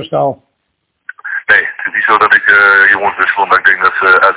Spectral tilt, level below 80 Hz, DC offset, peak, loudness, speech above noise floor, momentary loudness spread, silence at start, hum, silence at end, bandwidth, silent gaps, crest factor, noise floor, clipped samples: -6.5 dB/octave; -52 dBFS; under 0.1%; 0 dBFS; -8 LUFS; 58 dB; 11 LU; 0 s; none; 0 s; 4 kHz; none; 10 dB; -67 dBFS; 2%